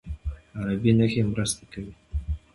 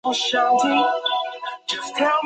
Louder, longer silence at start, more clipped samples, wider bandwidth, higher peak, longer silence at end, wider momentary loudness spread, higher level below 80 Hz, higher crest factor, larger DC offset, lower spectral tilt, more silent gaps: second, -26 LUFS vs -21 LUFS; about the same, 0.05 s vs 0.05 s; neither; first, 11.5 kHz vs 9.2 kHz; about the same, -8 dBFS vs -6 dBFS; first, 0.15 s vs 0 s; first, 15 LU vs 10 LU; first, -38 dBFS vs -72 dBFS; about the same, 18 dB vs 14 dB; neither; first, -6 dB/octave vs -1.5 dB/octave; neither